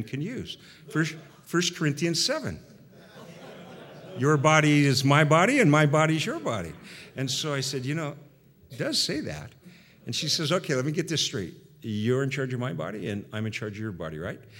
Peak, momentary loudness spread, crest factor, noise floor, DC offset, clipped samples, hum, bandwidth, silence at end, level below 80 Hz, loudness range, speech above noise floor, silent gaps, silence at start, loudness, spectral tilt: -4 dBFS; 22 LU; 24 dB; -52 dBFS; under 0.1%; under 0.1%; none; 16.5 kHz; 0 s; -62 dBFS; 8 LU; 26 dB; none; 0 s; -26 LUFS; -4.5 dB/octave